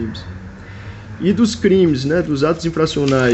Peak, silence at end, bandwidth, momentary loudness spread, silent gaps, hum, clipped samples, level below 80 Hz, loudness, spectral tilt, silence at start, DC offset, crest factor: -4 dBFS; 0 s; 8.4 kHz; 20 LU; none; none; under 0.1%; -40 dBFS; -16 LUFS; -6 dB/octave; 0 s; under 0.1%; 14 dB